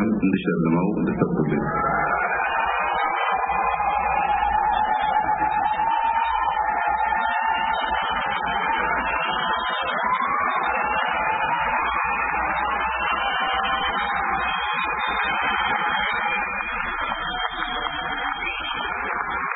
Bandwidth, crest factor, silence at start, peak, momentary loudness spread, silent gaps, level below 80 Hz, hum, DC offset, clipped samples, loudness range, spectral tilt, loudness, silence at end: 4 kHz; 18 dB; 0 s; -6 dBFS; 4 LU; none; -44 dBFS; none; under 0.1%; under 0.1%; 2 LU; -9.5 dB/octave; -22 LUFS; 0 s